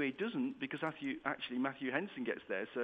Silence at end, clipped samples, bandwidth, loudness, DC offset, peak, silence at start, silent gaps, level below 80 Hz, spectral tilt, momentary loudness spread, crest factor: 0 s; under 0.1%; 8 kHz; -39 LUFS; under 0.1%; -18 dBFS; 0 s; none; -78 dBFS; -7 dB/octave; 3 LU; 20 dB